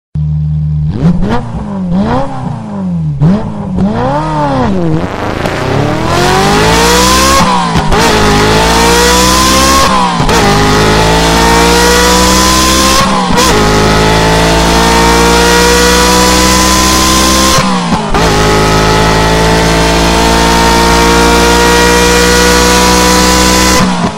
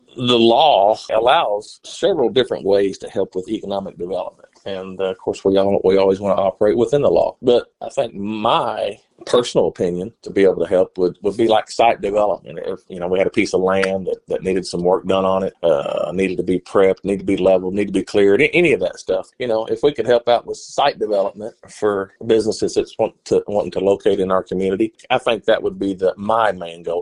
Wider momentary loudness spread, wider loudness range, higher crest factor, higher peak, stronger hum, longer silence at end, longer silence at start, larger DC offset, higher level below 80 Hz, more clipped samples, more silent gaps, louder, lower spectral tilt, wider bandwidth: about the same, 8 LU vs 10 LU; first, 7 LU vs 3 LU; second, 8 dB vs 16 dB; about the same, 0 dBFS vs -2 dBFS; neither; about the same, 0 s vs 0 s; about the same, 0.15 s vs 0.15 s; neither; first, -18 dBFS vs -50 dBFS; first, 0.7% vs under 0.1%; neither; first, -7 LUFS vs -18 LUFS; second, -3.5 dB/octave vs -5.5 dB/octave; first, 17 kHz vs 11 kHz